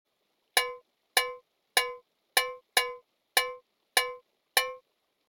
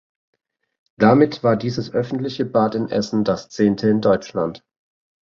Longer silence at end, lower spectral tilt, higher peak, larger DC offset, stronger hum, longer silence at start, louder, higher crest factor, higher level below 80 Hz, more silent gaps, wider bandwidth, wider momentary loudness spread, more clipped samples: about the same, 0.55 s vs 0.65 s; second, 2.5 dB/octave vs -7 dB/octave; second, -6 dBFS vs -2 dBFS; neither; neither; second, 0.55 s vs 1 s; second, -29 LUFS vs -19 LUFS; first, 26 dB vs 18 dB; second, -72 dBFS vs -56 dBFS; neither; first, over 20 kHz vs 7.2 kHz; first, 21 LU vs 9 LU; neither